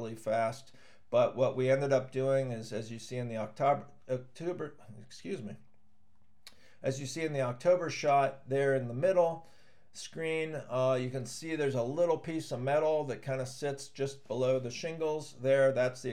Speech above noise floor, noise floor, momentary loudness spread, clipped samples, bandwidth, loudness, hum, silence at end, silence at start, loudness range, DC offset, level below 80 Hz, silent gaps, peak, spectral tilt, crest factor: 40 dB; -72 dBFS; 12 LU; under 0.1%; 13 kHz; -32 LUFS; none; 0 s; 0 s; 7 LU; 0.2%; -78 dBFS; none; -16 dBFS; -5.5 dB/octave; 18 dB